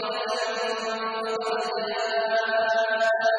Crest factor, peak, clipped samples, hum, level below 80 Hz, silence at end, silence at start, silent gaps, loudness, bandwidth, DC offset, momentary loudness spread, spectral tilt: 14 dB; -12 dBFS; under 0.1%; none; -72 dBFS; 0 s; 0 s; none; -26 LUFS; 10.5 kHz; under 0.1%; 6 LU; -1.5 dB/octave